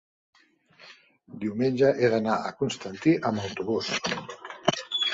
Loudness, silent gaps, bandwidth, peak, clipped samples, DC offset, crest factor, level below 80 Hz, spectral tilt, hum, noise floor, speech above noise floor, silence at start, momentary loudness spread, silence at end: -27 LUFS; none; 8 kHz; -2 dBFS; under 0.1%; under 0.1%; 26 dB; -64 dBFS; -5 dB/octave; none; -58 dBFS; 32 dB; 0.8 s; 11 LU; 0 s